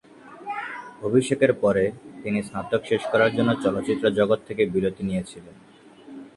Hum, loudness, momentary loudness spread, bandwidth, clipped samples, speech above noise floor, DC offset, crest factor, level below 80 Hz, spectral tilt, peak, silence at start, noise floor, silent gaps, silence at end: none; -24 LUFS; 15 LU; 11.5 kHz; under 0.1%; 21 dB; under 0.1%; 20 dB; -56 dBFS; -6 dB/octave; -4 dBFS; 0.25 s; -44 dBFS; none; 0.1 s